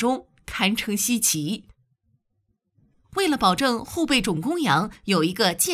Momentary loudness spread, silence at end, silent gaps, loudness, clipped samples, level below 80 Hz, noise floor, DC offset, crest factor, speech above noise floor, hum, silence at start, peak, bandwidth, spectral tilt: 10 LU; 0 s; none; -22 LUFS; under 0.1%; -52 dBFS; -73 dBFS; under 0.1%; 18 dB; 50 dB; none; 0 s; -6 dBFS; 16 kHz; -3 dB/octave